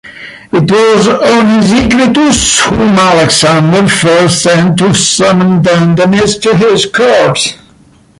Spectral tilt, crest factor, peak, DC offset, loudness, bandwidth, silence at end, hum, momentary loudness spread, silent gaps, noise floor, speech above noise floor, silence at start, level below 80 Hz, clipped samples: -4.5 dB/octave; 8 dB; 0 dBFS; under 0.1%; -7 LUFS; 11.5 kHz; 0.65 s; none; 3 LU; none; -42 dBFS; 35 dB; 0.05 s; -34 dBFS; under 0.1%